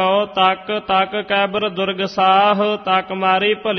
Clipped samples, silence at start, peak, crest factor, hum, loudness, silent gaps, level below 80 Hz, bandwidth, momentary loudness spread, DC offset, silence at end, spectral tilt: under 0.1%; 0 s; -2 dBFS; 14 dB; none; -17 LUFS; none; -58 dBFS; 6.4 kHz; 7 LU; under 0.1%; 0 s; -5.5 dB/octave